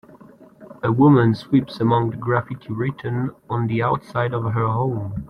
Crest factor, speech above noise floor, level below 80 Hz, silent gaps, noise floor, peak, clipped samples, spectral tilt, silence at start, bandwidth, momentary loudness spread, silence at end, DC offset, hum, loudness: 18 dB; 27 dB; -52 dBFS; none; -46 dBFS; -4 dBFS; under 0.1%; -9.5 dB/octave; 0.15 s; 5.4 kHz; 11 LU; 0.05 s; under 0.1%; none; -21 LUFS